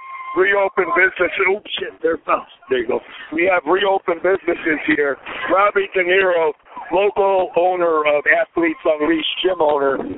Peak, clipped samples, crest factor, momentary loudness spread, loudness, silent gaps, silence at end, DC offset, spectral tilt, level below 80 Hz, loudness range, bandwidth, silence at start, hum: -2 dBFS; under 0.1%; 16 dB; 7 LU; -17 LUFS; none; 0 s; under 0.1%; -9 dB/octave; -54 dBFS; 2 LU; 4 kHz; 0 s; none